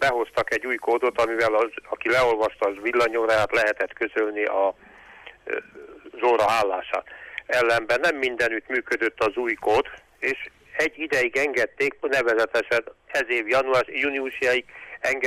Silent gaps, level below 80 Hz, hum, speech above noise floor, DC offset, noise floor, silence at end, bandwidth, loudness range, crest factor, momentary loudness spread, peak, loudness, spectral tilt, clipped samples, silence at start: none; -58 dBFS; none; 23 dB; under 0.1%; -47 dBFS; 0 s; 15.5 kHz; 3 LU; 14 dB; 9 LU; -10 dBFS; -23 LUFS; -3.5 dB/octave; under 0.1%; 0 s